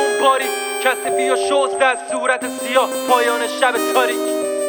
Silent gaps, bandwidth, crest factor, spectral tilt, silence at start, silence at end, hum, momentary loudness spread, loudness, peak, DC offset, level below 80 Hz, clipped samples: none; over 20 kHz; 16 dB; -0.5 dB/octave; 0 s; 0 s; none; 4 LU; -17 LUFS; -2 dBFS; under 0.1%; -72 dBFS; under 0.1%